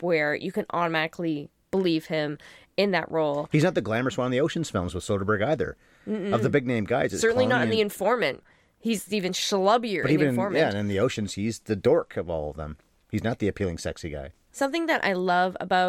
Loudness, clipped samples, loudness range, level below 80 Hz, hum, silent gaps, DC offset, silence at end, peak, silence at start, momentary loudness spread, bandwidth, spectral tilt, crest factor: -26 LUFS; under 0.1%; 4 LU; -54 dBFS; none; none; under 0.1%; 0 s; -8 dBFS; 0 s; 11 LU; 16.5 kHz; -5.5 dB/octave; 18 dB